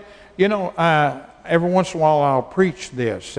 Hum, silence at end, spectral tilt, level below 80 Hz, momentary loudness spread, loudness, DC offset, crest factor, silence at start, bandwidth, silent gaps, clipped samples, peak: none; 0 s; -6 dB/octave; -54 dBFS; 8 LU; -19 LUFS; under 0.1%; 16 dB; 0 s; 10.5 kHz; none; under 0.1%; -4 dBFS